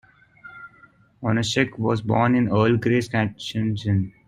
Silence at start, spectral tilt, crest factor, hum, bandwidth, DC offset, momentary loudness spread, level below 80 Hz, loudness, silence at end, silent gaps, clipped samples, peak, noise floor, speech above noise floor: 0.45 s; -6.5 dB/octave; 18 dB; none; 11.5 kHz; under 0.1%; 10 LU; -54 dBFS; -22 LUFS; 0.2 s; none; under 0.1%; -4 dBFS; -54 dBFS; 33 dB